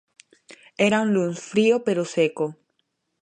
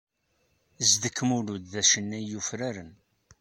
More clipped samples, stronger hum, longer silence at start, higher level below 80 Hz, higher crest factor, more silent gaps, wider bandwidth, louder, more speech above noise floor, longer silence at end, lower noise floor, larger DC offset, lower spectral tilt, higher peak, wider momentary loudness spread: neither; neither; second, 0.5 s vs 0.8 s; about the same, -70 dBFS vs -66 dBFS; about the same, 18 dB vs 22 dB; neither; second, 10 kHz vs 16 kHz; first, -22 LUFS vs -26 LUFS; first, 53 dB vs 44 dB; first, 0.7 s vs 0.5 s; about the same, -74 dBFS vs -72 dBFS; neither; first, -5.5 dB/octave vs -2 dB/octave; about the same, -6 dBFS vs -8 dBFS; about the same, 10 LU vs 12 LU